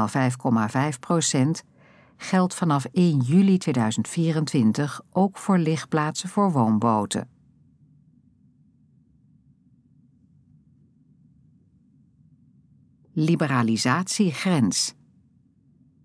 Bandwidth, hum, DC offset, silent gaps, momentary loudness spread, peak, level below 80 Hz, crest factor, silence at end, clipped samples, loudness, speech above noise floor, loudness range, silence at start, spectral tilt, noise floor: 11 kHz; none; under 0.1%; none; 6 LU; -6 dBFS; -70 dBFS; 18 dB; 1.15 s; under 0.1%; -23 LUFS; 38 dB; 7 LU; 0 s; -5.5 dB/octave; -60 dBFS